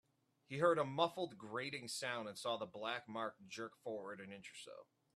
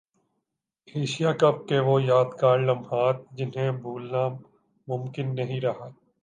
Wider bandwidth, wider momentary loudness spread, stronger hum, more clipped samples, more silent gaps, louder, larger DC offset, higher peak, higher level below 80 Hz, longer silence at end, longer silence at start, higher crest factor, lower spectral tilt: first, 13.5 kHz vs 9.6 kHz; first, 16 LU vs 12 LU; neither; neither; neither; second, -42 LUFS vs -25 LUFS; neither; second, -20 dBFS vs -6 dBFS; second, -86 dBFS vs -72 dBFS; about the same, 0.3 s vs 0.3 s; second, 0.5 s vs 0.95 s; about the same, 22 dB vs 20 dB; second, -4 dB/octave vs -7 dB/octave